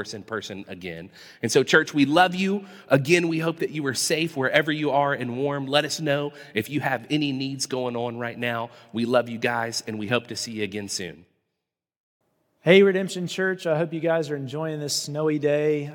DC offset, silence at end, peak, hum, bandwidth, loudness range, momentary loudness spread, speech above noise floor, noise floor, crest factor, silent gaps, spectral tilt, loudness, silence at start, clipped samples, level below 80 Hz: under 0.1%; 0 s; -2 dBFS; none; 18 kHz; 5 LU; 12 LU; 60 dB; -84 dBFS; 22 dB; 11.97-12.20 s; -4.5 dB/octave; -24 LUFS; 0 s; under 0.1%; -72 dBFS